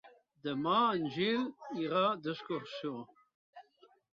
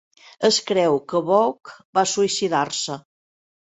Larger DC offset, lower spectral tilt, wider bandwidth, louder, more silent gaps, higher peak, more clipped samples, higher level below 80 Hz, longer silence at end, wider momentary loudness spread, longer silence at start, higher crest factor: neither; about the same, -3.5 dB/octave vs -3 dB/octave; second, 7.4 kHz vs 8.4 kHz; second, -34 LUFS vs -21 LUFS; first, 3.34-3.53 s vs 1.85-1.93 s; second, -18 dBFS vs -4 dBFS; neither; second, -78 dBFS vs -68 dBFS; second, 0.55 s vs 0.7 s; first, 13 LU vs 8 LU; second, 0.05 s vs 0.4 s; about the same, 18 dB vs 18 dB